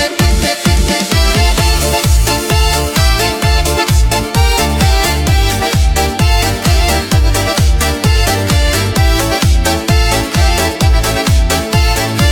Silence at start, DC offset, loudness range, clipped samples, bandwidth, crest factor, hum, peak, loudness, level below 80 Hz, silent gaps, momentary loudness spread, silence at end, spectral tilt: 0 s; under 0.1%; 0 LU; under 0.1%; 18 kHz; 10 dB; none; 0 dBFS; -12 LUFS; -14 dBFS; none; 1 LU; 0 s; -4 dB/octave